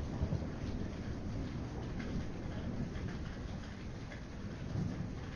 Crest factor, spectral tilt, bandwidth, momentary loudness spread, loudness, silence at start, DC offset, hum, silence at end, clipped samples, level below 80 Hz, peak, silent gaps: 18 dB; -7 dB/octave; 10.5 kHz; 7 LU; -42 LUFS; 0 s; under 0.1%; none; 0 s; under 0.1%; -46 dBFS; -22 dBFS; none